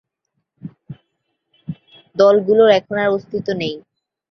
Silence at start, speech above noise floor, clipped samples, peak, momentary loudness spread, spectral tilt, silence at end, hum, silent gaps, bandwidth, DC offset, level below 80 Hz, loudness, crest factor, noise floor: 0.65 s; 59 dB; under 0.1%; -2 dBFS; 25 LU; -6 dB/octave; 0.5 s; none; none; 6.4 kHz; under 0.1%; -60 dBFS; -16 LUFS; 18 dB; -74 dBFS